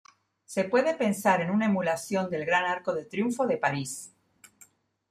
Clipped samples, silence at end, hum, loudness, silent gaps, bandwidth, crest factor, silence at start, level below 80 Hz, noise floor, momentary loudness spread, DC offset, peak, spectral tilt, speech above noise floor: under 0.1%; 1.05 s; none; -27 LUFS; none; 15.5 kHz; 20 dB; 0.5 s; -72 dBFS; -60 dBFS; 9 LU; under 0.1%; -10 dBFS; -5 dB/octave; 33 dB